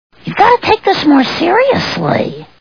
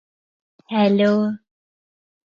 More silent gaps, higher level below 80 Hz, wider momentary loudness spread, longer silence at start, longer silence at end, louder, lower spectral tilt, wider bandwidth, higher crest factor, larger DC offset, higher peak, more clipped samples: neither; first, -46 dBFS vs -70 dBFS; second, 7 LU vs 10 LU; second, 0.25 s vs 0.7 s; second, 0.15 s vs 0.85 s; first, -11 LUFS vs -19 LUFS; second, -6 dB/octave vs -8 dB/octave; second, 5.4 kHz vs 6.8 kHz; about the same, 12 dB vs 16 dB; first, 0.5% vs under 0.1%; first, 0 dBFS vs -6 dBFS; first, 0.2% vs under 0.1%